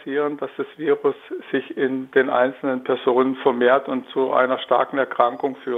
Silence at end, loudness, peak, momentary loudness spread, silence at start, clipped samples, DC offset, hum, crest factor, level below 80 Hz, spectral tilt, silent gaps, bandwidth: 0 s; -21 LUFS; -2 dBFS; 8 LU; 0 s; under 0.1%; under 0.1%; none; 20 dB; -74 dBFS; -7.5 dB/octave; none; 4 kHz